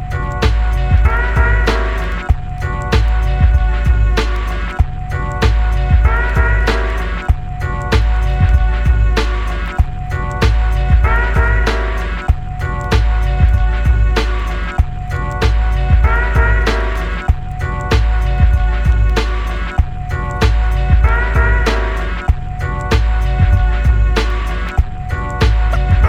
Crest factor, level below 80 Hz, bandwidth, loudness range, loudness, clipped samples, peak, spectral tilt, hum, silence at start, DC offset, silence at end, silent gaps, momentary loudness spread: 12 dB; -14 dBFS; 8 kHz; 1 LU; -16 LUFS; under 0.1%; 0 dBFS; -6.5 dB/octave; none; 0 s; under 0.1%; 0 s; none; 7 LU